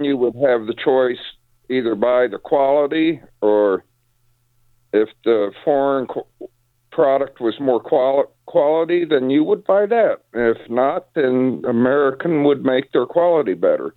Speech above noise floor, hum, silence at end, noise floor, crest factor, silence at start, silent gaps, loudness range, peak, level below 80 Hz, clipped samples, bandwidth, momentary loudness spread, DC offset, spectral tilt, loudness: 44 dB; none; 0.05 s; -61 dBFS; 16 dB; 0 s; none; 3 LU; -2 dBFS; -60 dBFS; under 0.1%; 4.4 kHz; 5 LU; under 0.1%; -8.5 dB/octave; -18 LUFS